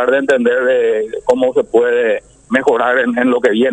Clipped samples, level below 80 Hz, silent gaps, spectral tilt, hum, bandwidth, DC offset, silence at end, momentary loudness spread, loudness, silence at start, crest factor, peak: under 0.1%; -54 dBFS; none; -5 dB/octave; none; 9.2 kHz; under 0.1%; 0 s; 4 LU; -14 LUFS; 0 s; 14 dB; 0 dBFS